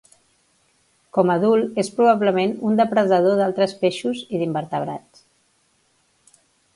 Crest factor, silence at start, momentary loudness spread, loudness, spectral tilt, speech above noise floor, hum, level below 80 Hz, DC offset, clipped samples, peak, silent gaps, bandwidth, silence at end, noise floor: 18 dB; 1.15 s; 9 LU; -20 LUFS; -6.5 dB/octave; 45 dB; none; -68 dBFS; under 0.1%; under 0.1%; -2 dBFS; none; 11.5 kHz; 1.75 s; -64 dBFS